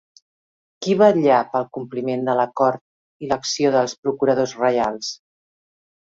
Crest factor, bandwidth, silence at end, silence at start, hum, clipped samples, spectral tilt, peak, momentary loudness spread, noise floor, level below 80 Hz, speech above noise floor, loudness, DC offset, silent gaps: 20 dB; 7.8 kHz; 0.95 s; 0.8 s; none; under 0.1%; -5 dB/octave; -2 dBFS; 14 LU; under -90 dBFS; -62 dBFS; over 71 dB; -20 LUFS; under 0.1%; 2.81-3.20 s, 3.98-4.03 s